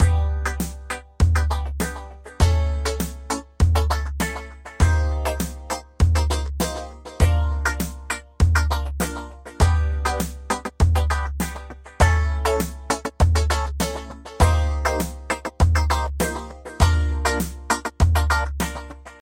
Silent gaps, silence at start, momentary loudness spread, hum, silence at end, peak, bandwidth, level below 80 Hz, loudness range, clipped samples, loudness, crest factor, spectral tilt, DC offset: none; 0 s; 11 LU; none; 0.1 s; -2 dBFS; 16.5 kHz; -24 dBFS; 2 LU; under 0.1%; -23 LUFS; 18 dB; -5 dB/octave; under 0.1%